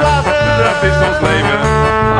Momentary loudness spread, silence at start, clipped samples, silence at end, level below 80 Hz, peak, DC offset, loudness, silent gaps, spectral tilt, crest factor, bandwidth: 1 LU; 0 s; under 0.1%; 0 s; -24 dBFS; 0 dBFS; under 0.1%; -12 LUFS; none; -5.5 dB/octave; 12 dB; 10 kHz